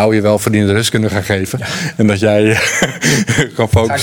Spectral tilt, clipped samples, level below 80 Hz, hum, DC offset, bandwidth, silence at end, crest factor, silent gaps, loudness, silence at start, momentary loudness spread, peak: -4.5 dB/octave; under 0.1%; -40 dBFS; none; under 0.1%; 19.5 kHz; 0 s; 12 dB; none; -13 LUFS; 0 s; 6 LU; 0 dBFS